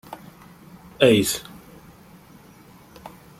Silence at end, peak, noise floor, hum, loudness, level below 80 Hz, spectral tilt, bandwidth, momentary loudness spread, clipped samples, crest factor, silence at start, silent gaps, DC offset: 0.3 s; -2 dBFS; -49 dBFS; none; -19 LUFS; -56 dBFS; -4 dB/octave; 16.5 kHz; 27 LU; under 0.1%; 24 dB; 0.1 s; none; under 0.1%